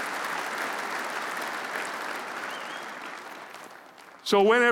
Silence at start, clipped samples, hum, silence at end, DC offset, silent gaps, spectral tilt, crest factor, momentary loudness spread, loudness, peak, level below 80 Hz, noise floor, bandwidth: 0 s; under 0.1%; none; 0 s; under 0.1%; none; -3 dB/octave; 20 dB; 19 LU; -29 LUFS; -8 dBFS; -78 dBFS; -49 dBFS; 17 kHz